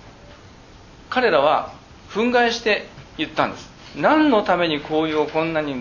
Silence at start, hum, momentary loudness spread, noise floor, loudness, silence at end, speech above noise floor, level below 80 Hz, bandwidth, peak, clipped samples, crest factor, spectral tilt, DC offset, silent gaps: 0.05 s; none; 13 LU; -45 dBFS; -20 LUFS; 0 s; 25 dB; -50 dBFS; 7.4 kHz; -2 dBFS; under 0.1%; 20 dB; -5 dB/octave; under 0.1%; none